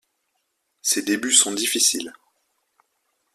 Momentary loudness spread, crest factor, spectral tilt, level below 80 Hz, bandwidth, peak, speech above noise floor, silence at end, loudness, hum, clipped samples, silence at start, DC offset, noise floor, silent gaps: 12 LU; 24 dB; 0 dB/octave; -70 dBFS; 15.5 kHz; -2 dBFS; 53 dB; 1.25 s; -19 LUFS; none; under 0.1%; 0.85 s; under 0.1%; -74 dBFS; none